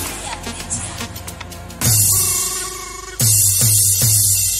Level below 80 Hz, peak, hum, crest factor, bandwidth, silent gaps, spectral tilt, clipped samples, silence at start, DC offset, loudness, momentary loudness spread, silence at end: -38 dBFS; 0 dBFS; none; 16 dB; 16.5 kHz; none; -2 dB/octave; under 0.1%; 0 s; under 0.1%; -13 LUFS; 17 LU; 0 s